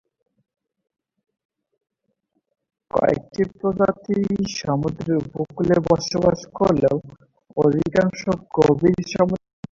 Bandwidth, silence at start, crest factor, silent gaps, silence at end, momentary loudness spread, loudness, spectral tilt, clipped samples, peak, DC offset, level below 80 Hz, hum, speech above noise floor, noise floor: 7.6 kHz; 2.95 s; 20 dB; none; 0.35 s; 7 LU; -21 LUFS; -6.5 dB/octave; under 0.1%; -2 dBFS; under 0.1%; -50 dBFS; none; 52 dB; -72 dBFS